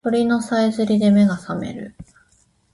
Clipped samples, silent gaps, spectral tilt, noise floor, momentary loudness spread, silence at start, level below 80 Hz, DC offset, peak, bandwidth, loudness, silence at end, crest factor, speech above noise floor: under 0.1%; none; -7 dB/octave; -60 dBFS; 16 LU; 0.05 s; -54 dBFS; under 0.1%; -6 dBFS; 11.5 kHz; -18 LUFS; 0.7 s; 14 dB; 42 dB